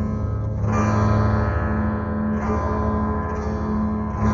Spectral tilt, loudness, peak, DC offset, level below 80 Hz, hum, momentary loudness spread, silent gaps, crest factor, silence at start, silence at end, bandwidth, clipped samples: -8.5 dB/octave; -22 LUFS; -8 dBFS; under 0.1%; -30 dBFS; none; 6 LU; none; 14 dB; 0 s; 0 s; 7.2 kHz; under 0.1%